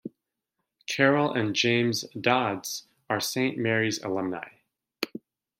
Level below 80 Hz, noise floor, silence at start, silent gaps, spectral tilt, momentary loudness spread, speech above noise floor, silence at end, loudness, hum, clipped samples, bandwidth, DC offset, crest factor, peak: -72 dBFS; -83 dBFS; 0.05 s; none; -4 dB/octave; 15 LU; 57 dB; 0.4 s; -26 LUFS; none; under 0.1%; 16 kHz; under 0.1%; 22 dB; -6 dBFS